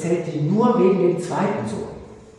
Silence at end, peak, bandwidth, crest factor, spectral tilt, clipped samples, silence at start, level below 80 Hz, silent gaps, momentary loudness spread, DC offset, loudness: 0.1 s; -4 dBFS; 11 kHz; 16 dB; -7.5 dB/octave; under 0.1%; 0 s; -54 dBFS; none; 15 LU; under 0.1%; -20 LUFS